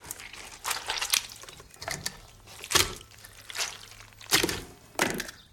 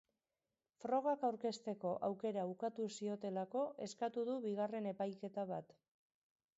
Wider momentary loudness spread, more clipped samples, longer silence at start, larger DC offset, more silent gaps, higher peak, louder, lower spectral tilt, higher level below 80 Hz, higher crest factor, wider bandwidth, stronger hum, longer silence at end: first, 21 LU vs 6 LU; neither; second, 0 s vs 0.85 s; neither; neither; first, -6 dBFS vs -26 dBFS; first, -29 LUFS vs -42 LUFS; second, -1 dB/octave vs -5.5 dB/octave; first, -54 dBFS vs -88 dBFS; first, 28 dB vs 16 dB; first, 17 kHz vs 7.6 kHz; neither; second, 0.1 s vs 0.95 s